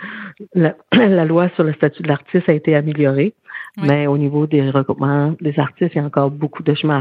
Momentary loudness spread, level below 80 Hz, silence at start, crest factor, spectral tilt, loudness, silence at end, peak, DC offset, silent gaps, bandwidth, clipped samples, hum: 7 LU; -64 dBFS; 0 s; 16 dB; -10 dB/octave; -17 LUFS; 0 s; 0 dBFS; under 0.1%; none; 5.2 kHz; under 0.1%; none